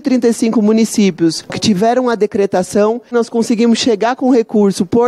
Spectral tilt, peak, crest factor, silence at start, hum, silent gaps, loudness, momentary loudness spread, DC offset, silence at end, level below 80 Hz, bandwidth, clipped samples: -5 dB/octave; -2 dBFS; 10 dB; 0.05 s; none; none; -13 LUFS; 4 LU; under 0.1%; 0 s; -54 dBFS; 13 kHz; under 0.1%